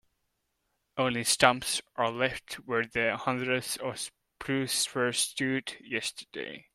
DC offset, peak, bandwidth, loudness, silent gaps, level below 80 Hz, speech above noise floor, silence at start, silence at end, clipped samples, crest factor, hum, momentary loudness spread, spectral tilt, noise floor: under 0.1%; -4 dBFS; 16 kHz; -29 LUFS; none; -64 dBFS; 49 dB; 0.95 s; 0.15 s; under 0.1%; 28 dB; none; 16 LU; -2.5 dB/octave; -79 dBFS